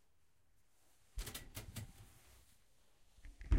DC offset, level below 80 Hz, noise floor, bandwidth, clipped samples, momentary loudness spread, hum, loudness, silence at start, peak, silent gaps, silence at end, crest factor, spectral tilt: under 0.1%; -48 dBFS; -79 dBFS; 16 kHz; under 0.1%; 17 LU; none; -52 LUFS; 1.15 s; -22 dBFS; none; 0 s; 24 dB; -4.5 dB/octave